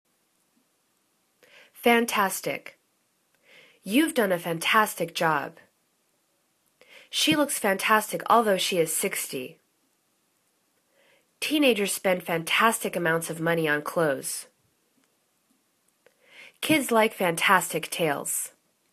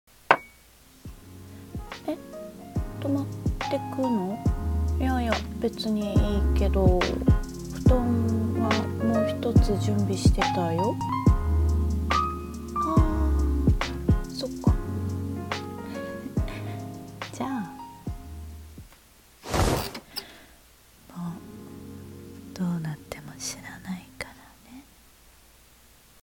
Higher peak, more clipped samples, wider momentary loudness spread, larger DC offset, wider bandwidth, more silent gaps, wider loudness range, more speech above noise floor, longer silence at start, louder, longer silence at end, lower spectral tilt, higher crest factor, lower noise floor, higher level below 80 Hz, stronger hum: about the same, -4 dBFS vs -2 dBFS; neither; second, 11 LU vs 19 LU; neither; second, 14 kHz vs 17.5 kHz; neither; second, 5 LU vs 12 LU; first, 46 dB vs 31 dB; first, 1.8 s vs 0.3 s; first, -24 LUFS vs -27 LUFS; second, 0.45 s vs 1.45 s; second, -3 dB/octave vs -6.5 dB/octave; about the same, 24 dB vs 24 dB; first, -71 dBFS vs -55 dBFS; second, -74 dBFS vs -32 dBFS; neither